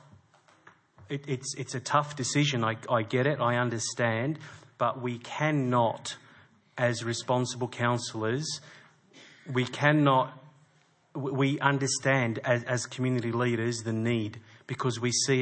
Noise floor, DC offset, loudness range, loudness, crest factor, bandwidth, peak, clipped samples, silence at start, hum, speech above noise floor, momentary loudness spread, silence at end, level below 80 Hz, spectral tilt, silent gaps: -65 dBFS; under 0.1%; 3 LU; -29 LUFS; 22 dB; 8.8 kHz; -6 dBFS; under 0.1%; 1 s; none; 37 dB; 12 LU; 0 s; -74 dBFS; -4.5 dB/octave; none